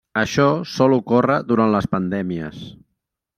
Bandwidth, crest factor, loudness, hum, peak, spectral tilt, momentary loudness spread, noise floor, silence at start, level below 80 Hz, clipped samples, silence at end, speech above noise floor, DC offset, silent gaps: 14 kHz; 18 dB; -19 LUFS; none; -2 dBFS; -6.5 dB/octave; 13 LU; -77 dBFS; 0.15 s; -52 dBFS; under 0.1%; 0.65 s; 58 dB; under 0.1%; none